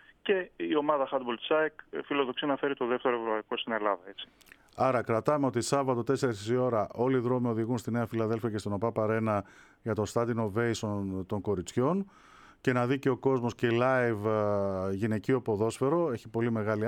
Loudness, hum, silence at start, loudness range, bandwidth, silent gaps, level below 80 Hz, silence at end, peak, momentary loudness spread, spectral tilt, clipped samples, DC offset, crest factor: -30 LUFS; none; 0.25 s; 3 LU; 16 kHz; none; -66 dBFS; 0 s; -12 dBFS; 5 LU; -6 dB/octave; under 0.1%; under 0.1%; 18 dB